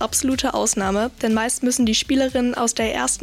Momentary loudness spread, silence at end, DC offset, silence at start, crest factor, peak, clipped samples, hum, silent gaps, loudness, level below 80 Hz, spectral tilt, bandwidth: 3 LU; 0 s; under 0.1%; 0 s; 12 dB; -8 dBFS; under 0.1%; none; none; -20 LUFS; -42 dBFS; -2.5 dB/octave; 15.5 kHz